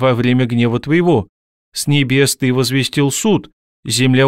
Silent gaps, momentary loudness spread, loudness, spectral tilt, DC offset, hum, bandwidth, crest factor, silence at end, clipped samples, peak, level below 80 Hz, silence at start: 1.29-1.72 s, 3.53-3.83 s; 7 LU; -15 LUFS; -5 dB/octave; under 0.1%; none; 16 kHz; 14 dB; 0 s; under 0.1%; -2 dBFS; -48 dBFS; 0 s